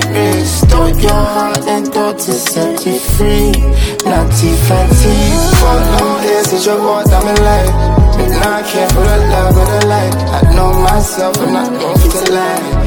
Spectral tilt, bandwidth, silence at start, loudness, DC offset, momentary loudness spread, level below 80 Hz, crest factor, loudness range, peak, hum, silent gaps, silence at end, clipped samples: -5 dB/octave; over 20 kHz; 0 s; -11 LUFS; under 0.1%; 4 LU; -14 dBFS; 10 dB; 2 LU; 0 dBFS; none; none; 0 s; under 0.1%